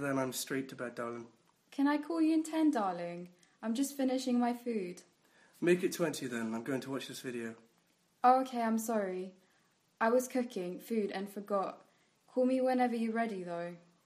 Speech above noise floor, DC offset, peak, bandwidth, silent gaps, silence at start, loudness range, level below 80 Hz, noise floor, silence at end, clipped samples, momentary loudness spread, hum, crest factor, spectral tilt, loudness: 39 dB; under 0.1%; -12 dBFS; 15.5 kHz; none; 0 s; 3 LU; -86 dBFS; -73 dBFS; 0.3 s; under 0.1%; 12 LU; none; 22 dB; -5 dB/octave; -34 LUFS